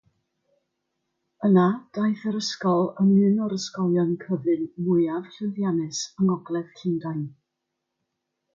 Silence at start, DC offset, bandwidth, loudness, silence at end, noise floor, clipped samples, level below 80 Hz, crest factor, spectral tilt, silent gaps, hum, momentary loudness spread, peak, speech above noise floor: 1.4 s; under 0.1%; 7.6 kHz; -24 LUFS; 1.25 s; -81 dBFS; under 0.1%; -72 dBFS; 18 dB; -6.5 dB/octave; none; none; 11 LU; -8 dBFS; 58 dB